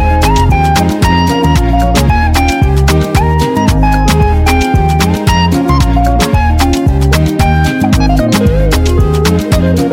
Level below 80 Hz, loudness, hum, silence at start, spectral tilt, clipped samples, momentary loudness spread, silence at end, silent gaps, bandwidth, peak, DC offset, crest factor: -14 dBFS; -10 LUFS; none; 0 s; -6 dB/octave; under 0.1%; 1 LU; 0 s; none; 16.5 kHz; 0 dBFS; under 0.1%; 8 dB